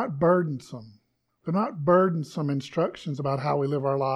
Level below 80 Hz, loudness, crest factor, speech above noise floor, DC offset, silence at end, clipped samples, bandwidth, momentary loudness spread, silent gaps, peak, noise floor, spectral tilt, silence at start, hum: -62 dBFS; -26 LUFS; 18 dB; 44 dB; under 0.1%; 0 s; under 0.1%; 11 kHz; 13 LU; none; -8 dBFS; -69 dBFS; -8 dB/octave; 0 s; none